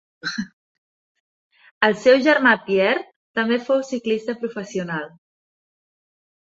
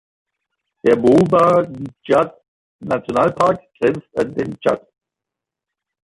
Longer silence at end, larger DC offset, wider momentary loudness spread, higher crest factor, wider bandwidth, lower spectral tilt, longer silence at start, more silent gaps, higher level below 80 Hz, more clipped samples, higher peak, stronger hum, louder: about the same, 1.4 s vs 1.3 s; neither; about the same, 14 LU vs 12 LU; first, 22 dB vs 16 dB; second, 8 kHz vs 11.5 kHz; second, -5 dB/octave vs -7.5 dB/octave; second, 0.25 s vs 0.85 s; first, 0.53-1.50 s, 1.71-1.81 s, 3.16-3.34 s vs 2.48-2.79 s; second, -68 dBFS vs -54 dBFS; neither; about the same, 0 dBFS vs -2 dBFS; neither; second, -20 LUFS vs -17 LUFS